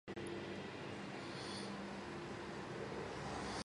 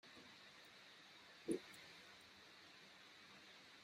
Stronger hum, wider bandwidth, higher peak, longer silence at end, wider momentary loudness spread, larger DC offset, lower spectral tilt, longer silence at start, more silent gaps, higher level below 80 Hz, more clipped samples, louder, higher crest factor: neither; second, 11.5 kHz vs 15.5 kHz; about the same, -32 dBFS vs -30 dBFS; about the same, 0.05 s vs 0 s; second, 2 LU vs 13 LU; neither; about the same, -4.5 dB/octave vs -3.5 dB/octave; about the same, 0.05 s vs 0.05 s; neither; first, -66 dBFS vs -90 dBFS; neither; first, -47 LUFS vs -56 LUFS; second, 14 dB vs 26 dB